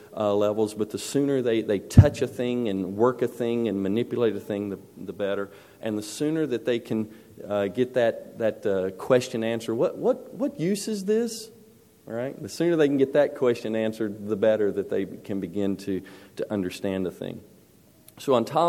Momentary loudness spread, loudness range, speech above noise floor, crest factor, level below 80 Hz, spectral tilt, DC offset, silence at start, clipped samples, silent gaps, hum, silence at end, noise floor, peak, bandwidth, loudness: 11 LU; 6 LU; 31 dB; 26 dB; -48 dBFS; -6.5 dB/octave; under 0.1%; 0 s; under 0.1%; none; none; 0 s; -56 dBFS; 0 dBFS; 16.5 kHz; -26 LUFS